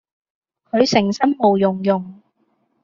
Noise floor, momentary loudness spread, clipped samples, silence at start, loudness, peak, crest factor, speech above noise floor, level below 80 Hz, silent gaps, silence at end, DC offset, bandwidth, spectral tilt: -65 dBFS; 8 LU; under 0.1%; 0.75 s; -18 LUFS; -2 dBFS; 18 dB; 49 dB; -58 dBFS; none; 0.7 s; under 0.1%; 7.4 kHz; -4.5 dB/octave